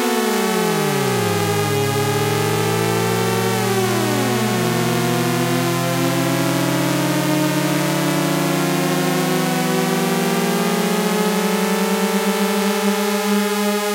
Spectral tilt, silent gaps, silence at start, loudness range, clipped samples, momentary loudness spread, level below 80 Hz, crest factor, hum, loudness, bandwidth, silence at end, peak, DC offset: -4.5 dB/octave; none; 0 s; 0 LU; under 0.1%; 0 LU; -56 dBFS; 12 dB; none; -18 LUFS; 16 kHz; 0 s; -6 dBFS; under 0.1%